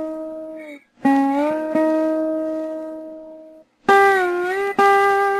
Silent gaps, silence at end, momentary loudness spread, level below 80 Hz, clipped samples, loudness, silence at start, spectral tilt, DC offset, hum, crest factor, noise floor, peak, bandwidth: none; 0 s; 20 LU; -62 dBFS; under 0.1%; -18 LUFS; 0 s; -4.5 dB/octave; under 0.1%; none; 18 dB; -45 dBFS; -2 dBFS; 14 kHz